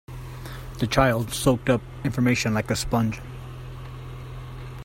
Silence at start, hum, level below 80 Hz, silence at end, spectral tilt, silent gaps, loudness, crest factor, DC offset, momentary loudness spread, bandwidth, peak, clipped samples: 0.1 s; none; -40 dBFS; 0 s; -5.5 dB/octave; none; -23 LUFS; 20 dB; under 0.1%; 17 LU; 16.5 kHz; -6 dBFS; under 0.1%